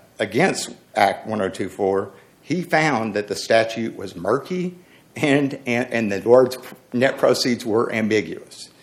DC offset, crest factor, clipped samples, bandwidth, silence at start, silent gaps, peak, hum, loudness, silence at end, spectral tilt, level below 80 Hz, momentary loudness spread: under 0.1%; 20 dB; under 0.1%; 16 kHz; 0.2 s; none; 0 dBFS; none; -21 LUFS; 0.15 s; -5 dB/octave; -66 dBFS; 11 LU